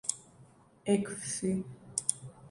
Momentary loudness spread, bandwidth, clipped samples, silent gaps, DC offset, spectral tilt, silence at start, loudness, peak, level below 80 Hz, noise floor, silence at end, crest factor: 12 LU; 11.5 kHz; under 0.1%; none; under 0.1%; -4 dB/octave; 0.05 s; -34 LUFS; -8 dBFS; -66 dBFS; -60 dBFS; 0 s; 28 dB